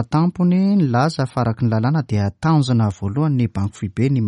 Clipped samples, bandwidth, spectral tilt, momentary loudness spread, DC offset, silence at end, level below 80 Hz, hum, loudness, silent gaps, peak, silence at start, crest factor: under 0.1%; 11 kHz; -8 dB/octave; 5 LU; under 0.1%; 0 s; -48 dBFS; none; -19 LUFS; none; -6 dBFS; 0 s; 12 dB